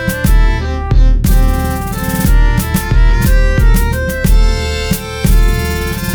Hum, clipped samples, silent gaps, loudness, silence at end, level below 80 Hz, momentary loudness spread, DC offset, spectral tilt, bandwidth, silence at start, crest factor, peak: none; under 0.1%; none; -14 LUFS; 0 s; -12 dBFS; 5 LU; under 0.1%; -5.5 dB/octave; over 20 kHz; 0 s; 10 dB; 0 dBFS